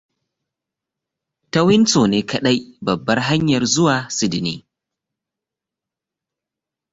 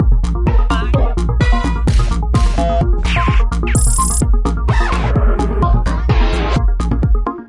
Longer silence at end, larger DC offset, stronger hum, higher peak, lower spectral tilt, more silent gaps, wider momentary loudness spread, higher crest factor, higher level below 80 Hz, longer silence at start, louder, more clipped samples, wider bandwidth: first, 2.35 s vs 0.05 s; neither; neither; about the same, -2 dBFS vs -2 dBFS; about the same, -4.5 dB/octave vs -5.5 dB/octave; neither; first, 9 LU vs 3 LU; first, 18 dB vs 10 dB; second, -54 dBFS vs -14 dBFS; first, 1.55 s vs 0 s; about the same, -17 LUFS vs -16 LUFS; neither; second, 8 kHz vs 11.5 kHz